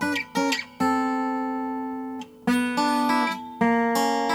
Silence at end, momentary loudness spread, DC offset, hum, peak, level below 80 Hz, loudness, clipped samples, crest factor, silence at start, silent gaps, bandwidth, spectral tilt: 0 s; 8 LU; under 0.1%; none; -10 dBFS; -68 dBFS; -25 LUFS; under 0.1%; 14 dB; 0 s; none; 17.5 kHz; -4 dB/octave